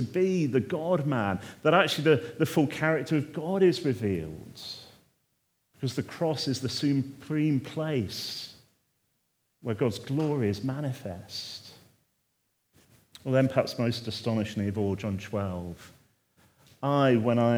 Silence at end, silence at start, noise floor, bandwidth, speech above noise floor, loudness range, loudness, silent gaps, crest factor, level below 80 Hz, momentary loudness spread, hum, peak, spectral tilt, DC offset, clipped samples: 0 s; 0 s; -75 dBFS; over 20 kHz; 48 dB; 7 LU; -28 LUFS; none; 22 dB; -68 dBFS; 15 LU; none; -6 dBFS; -6.5 dB/octave; under 0.1%; under 0.1%